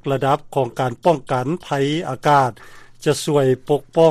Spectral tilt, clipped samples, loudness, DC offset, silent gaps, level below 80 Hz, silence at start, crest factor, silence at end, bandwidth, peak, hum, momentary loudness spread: -6 dB/octave; under 0.1%; -19 LUFS; under 0.1%; none; -52 dBFS; 0.05 s; 16 dB; 0 s; 15 kHz; -2 dBFS; none; 7 LU